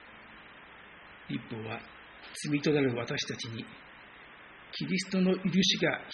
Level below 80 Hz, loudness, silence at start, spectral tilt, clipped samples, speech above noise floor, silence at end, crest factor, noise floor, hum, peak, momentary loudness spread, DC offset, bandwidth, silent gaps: -66 dBFS; -31 LUFS; 0 s; -4 dB/octave; under 0.1%; 21 dB; 0 s; 20 dB; -52 dBFS; none; -14 dBFS; 24 LU; under 0.1%; 8 kHz; none